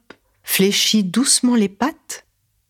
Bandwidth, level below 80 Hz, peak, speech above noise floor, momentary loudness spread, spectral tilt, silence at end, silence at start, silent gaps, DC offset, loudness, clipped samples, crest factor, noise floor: 19 kHz; -62 dBFS; -2 dBFS; 23 dB; 19 LU; -3 dB/octave; 0.5 s; 0.45 s; none; under 0.1%; -16 LUFS; under 0.1%; 16 dB; -40 dBFS